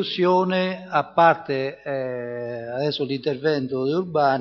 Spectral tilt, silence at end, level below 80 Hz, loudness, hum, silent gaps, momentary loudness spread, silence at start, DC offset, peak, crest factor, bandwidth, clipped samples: -7 dB/octave; 0 s; -68 dBFS; -23 LUFS; none; none; 11 LU; 0 s; under 0.1%; -4 dBFS; 18 dB; 6.8 kHz; under 0.1%